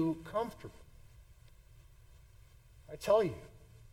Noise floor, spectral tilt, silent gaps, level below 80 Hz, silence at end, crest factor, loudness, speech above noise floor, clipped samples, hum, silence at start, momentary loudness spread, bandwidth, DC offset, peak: -59 dBFS; -6.5 dB/octave; none; -60 dBFS; 0.35 s; 22 dB; -34 LUFS; 25 dB; under 0.1%; none; 0 s; 23 LU; 17 kHz; under 0.1%; -18 dBFS